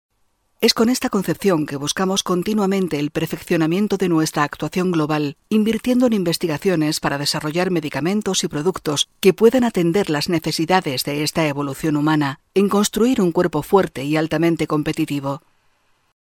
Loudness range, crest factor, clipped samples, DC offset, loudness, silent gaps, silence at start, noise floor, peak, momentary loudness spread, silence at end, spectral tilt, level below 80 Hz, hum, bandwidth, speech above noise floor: 2 LU; 18 dB; under 0.1%; under 0.1%; -19 LUFS; none; 0.6 s; -65 dBFS; 0 dBFS; 5 LU; 0.85 s; -5 dB/octave; -52 dBFS; none; 19 kHz; 46 dB